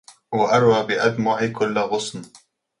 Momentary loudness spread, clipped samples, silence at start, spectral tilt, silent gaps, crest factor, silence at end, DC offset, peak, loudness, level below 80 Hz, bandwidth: 11 LU; under 0.1%; 0.3 s; -5 dB/octave; none; 18 dB; 0.55 s; under 0.1%; -4 dBFS; -20 LUFS; -60 dBFS; 11.5 kHz